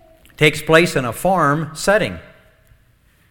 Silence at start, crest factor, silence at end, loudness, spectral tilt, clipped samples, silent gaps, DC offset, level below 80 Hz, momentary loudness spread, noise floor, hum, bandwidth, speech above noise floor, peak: 0.4 s; 18 dB; 1.1 s; -16 LUFS; -4.5 dB/octave; under 0.1%; none; under 0.1%; -44 dBFS; 6 LU; -55 dBFS; none; 19 kHz; 39 dB; 0 dBFS